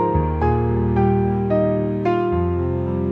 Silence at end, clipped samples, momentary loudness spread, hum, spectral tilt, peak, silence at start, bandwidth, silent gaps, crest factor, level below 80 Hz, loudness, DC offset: 0 s; under 0.1%; 4 LU; none; -11 dB/octave; -6 dBFS; 0 s; 5.2 kHz; none; 12 dB; -34 dBFS; -20 LUFS; 0.1%